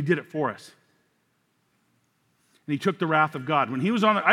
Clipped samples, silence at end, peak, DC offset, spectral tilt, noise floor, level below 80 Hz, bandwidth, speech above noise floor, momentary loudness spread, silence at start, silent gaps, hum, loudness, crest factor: under 0.1%; 0 s; -4 dBFS; under 0.1%; -6.5 dB/octave; -70 dBFS; -82 dBFS; 15 kHz; 46 dB; 10 LU; 0 s; none; none; -25 LUFS; 24 dB